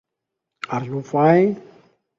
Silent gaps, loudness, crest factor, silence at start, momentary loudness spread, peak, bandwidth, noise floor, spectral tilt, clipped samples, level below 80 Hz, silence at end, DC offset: none; -19 LUFS; 18 dB; 0.7 s; 17 LU; -2 dBFS; 7.6 kHz; -82 dBFS; -8.5 dB/octave; under 0.1%; -64 dBFS; 0.6 s; under 0.1%